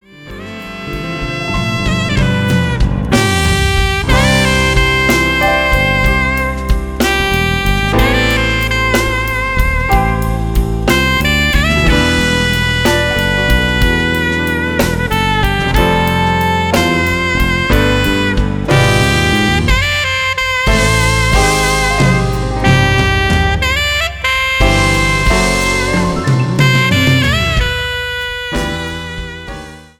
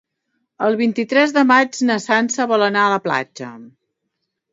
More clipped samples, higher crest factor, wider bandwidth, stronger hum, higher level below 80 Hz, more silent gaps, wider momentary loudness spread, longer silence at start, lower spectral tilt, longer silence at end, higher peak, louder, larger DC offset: neither; second, 12 dB vs 18 dB; first, 18.5 kHz vs 7.8 kHz; neither; first, -20 dBFS vs -70 dBFS; neither; about the same, 7 LU vs 9 LU; second, 0.15 s vs 0.6 s; about the same, -4.5 dB/octave vs -4 dB/octave; second, 0.15 s vs 0.85 s; about the same, 0 dBFS vs 0 dBFS; first, -12 LUFS vs -16 LUFS; neither